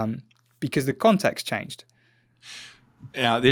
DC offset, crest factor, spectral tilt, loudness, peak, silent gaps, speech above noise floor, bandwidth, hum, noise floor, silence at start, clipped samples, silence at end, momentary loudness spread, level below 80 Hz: under 0.1%; 20 dB; -5 dB/octave; -24 LUFS; -6 dBFS; none; 39 dB; 19 kHz; none; -63 dBFS; 0 s; under 0.1%; 0 s; 21 LU; -64 dBFS